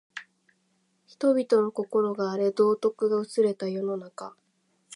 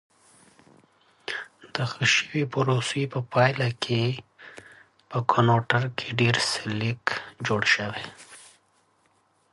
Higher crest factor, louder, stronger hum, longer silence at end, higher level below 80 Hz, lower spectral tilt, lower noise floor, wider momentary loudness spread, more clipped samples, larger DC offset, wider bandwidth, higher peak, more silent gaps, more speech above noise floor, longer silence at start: second, 18 dB vs 24 dB; about the same, -26 LUFS vs -25 LUFS; neither; second, 0.65 s vs 1.1 s; second, -82 dBFS vs -62 dBFS; first, -6.5 dB/octave vs -4.5 dB/octave; first, -71 dBFS vs -66 dBFS; about the same, 18 LU vs 16 LU; neither; neither; about the same, 11 kHz vs 11.5 kHz; second, -10 dBFS vs -4 dBFS; neither; first, 46 dB vs 41 dB; second, 0.15 s vs 1.3 s